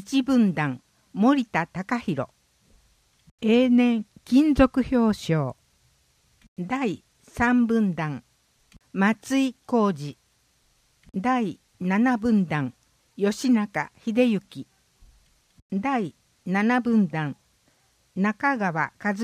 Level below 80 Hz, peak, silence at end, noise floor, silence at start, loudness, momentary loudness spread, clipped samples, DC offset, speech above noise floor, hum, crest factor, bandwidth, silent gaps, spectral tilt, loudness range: -50 dBFS; -4 dBFS; 0 s; -65 dBFS; 0 s; -24 LUFS; 15 LU; under 0.1%; under 0.1%; 43 dB; none; 22 dB; 13.5 kHz; 3.31-3.38 s, 6.48-6.56 s, 15.62-15.70 s; -6.5 dB/octave; 5 LU